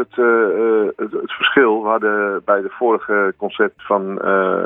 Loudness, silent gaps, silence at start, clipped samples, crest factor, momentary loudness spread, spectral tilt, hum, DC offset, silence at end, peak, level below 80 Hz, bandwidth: -17 LUFS; none; 0 s; under 0.1%; 16 dB; 6 LU; -8.5 dB/octave; none; under 0.1%; 0 s; 0 dBFS; -64 dBFS; 3.9 kHz